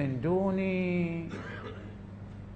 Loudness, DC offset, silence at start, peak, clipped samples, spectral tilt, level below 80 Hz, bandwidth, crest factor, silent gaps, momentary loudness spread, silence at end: -32 LUFS; under 0.1%; 0 s; -18 dBFS; under 0.1%; -9 dB/octave; -54 dBFS; 7.8 kHz; 14 dB; none; 16 LU; 0 s